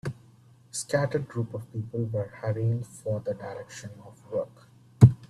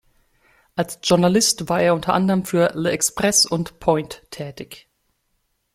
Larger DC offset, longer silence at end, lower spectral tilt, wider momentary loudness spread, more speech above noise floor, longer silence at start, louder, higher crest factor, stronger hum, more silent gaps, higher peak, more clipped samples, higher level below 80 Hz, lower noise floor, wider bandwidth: neither; second, 0.05 s vs 1 s; first, -7 dB/octave vs -3.5 dB/octave; second, 14 LU vs 17 LU; second, 25 dB vs 50 dB; second, 0.05 s vs 0.75 s; second, -29 LUFS vs -19 LUFS; first, 26 dB vs 18 dB; neither; neither; about the same, -2 dBFS vs -2 dBFS; neither; about the same, -54 dBFS vs -52 dBFS; second, -56 dBFS vs -70 dBFS; second, 12 kHz vs 16 kHz